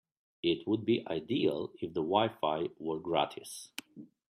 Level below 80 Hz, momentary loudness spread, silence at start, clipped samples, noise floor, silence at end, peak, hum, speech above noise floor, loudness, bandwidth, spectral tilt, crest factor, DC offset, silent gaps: -72 dBFS; 13 LU; 0.45 s; under 0.1%; -54 dBFS; 0.25 s; -12 dBFS; none; 21 dB; -33 LUFS; 15 kHz; -5.5 dB/octave; 20 dB; under 0.1%; none